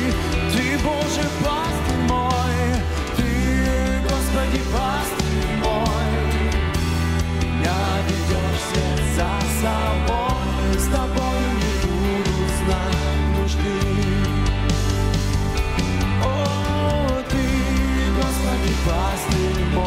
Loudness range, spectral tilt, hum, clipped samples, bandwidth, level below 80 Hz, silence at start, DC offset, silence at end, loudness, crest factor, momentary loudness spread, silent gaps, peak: 0 LU; -5.5 dB/octave; none; under 0.1%; 16 kHz; -24 dBFS; 0 s; under 0.1%; 0 s; -21 LUFS; 16 dB; 2 LU; none; -4 dBFS